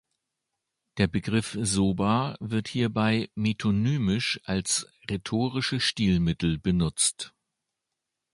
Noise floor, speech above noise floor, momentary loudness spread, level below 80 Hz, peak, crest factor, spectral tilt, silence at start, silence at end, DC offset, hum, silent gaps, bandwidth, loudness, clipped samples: -85 dBFS; 59 dB; 5 LU; -48 dBFS; -8 dBFS; 18 dB; -4.5 dB/octave; 0.95 s; 1.05 s; under 0.1%; none; none; 11.5 kHz; -26 LUFS; under 0.1%